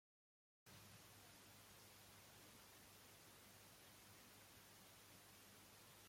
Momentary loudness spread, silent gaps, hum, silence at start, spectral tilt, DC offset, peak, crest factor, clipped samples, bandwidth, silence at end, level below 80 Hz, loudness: 1 LU; none; 50 Hz at -75 dBFS; 0.65 s; -2.5 dB/octave; under 0.1%; -52 dBFS; 14 dB; under 0.1%; 16.5 kHz; 0 s; -84 dBFS; -64 LUFS